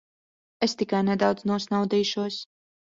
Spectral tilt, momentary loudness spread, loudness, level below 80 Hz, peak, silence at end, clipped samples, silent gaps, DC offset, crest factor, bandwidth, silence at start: -5.5 dB/octave; 8 LU; -26 LUFS; -66 dBFS; -8 dBFS; 0.55 s; under 0.1%; none; under 0.1%; 18 dB; 7.6 kHz; 0.6 s